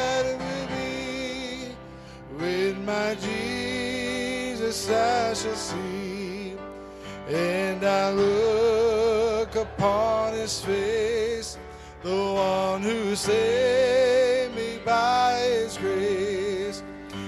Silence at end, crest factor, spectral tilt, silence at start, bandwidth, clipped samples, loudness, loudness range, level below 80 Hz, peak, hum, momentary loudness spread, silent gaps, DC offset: 0 s; 14 dB; -4 dB/octave; 0 s; 14 kHz; under 0.1%; -25 LUFS; 6 LU; -50 dBFS; -10 dBFS; none; 14 LU; none; under 0.1%